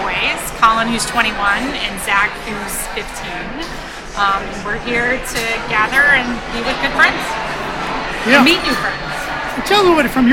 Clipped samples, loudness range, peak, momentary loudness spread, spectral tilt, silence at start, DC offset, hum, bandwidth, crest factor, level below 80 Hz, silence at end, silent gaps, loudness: under 0.1%; 6 LU; 0 dBFS; 13 LU; -3 dB/octave; 0 s; under 0.1%; none; 17 kHz; 16 dB; -34 dBFS; 0 s; none; -15 LUFS